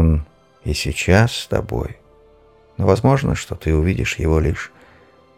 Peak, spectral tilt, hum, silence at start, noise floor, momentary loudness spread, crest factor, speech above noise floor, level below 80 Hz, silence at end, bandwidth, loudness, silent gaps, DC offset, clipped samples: -2 dBFS; -6 dB/octave; none; 0 s; -51 dBFS; 16 LU; 18 dB; 33 dB; -28 dBFS; 0.7 s; 15.5 kHz; -19 LUFS; none; under 0.1%; under 0.1%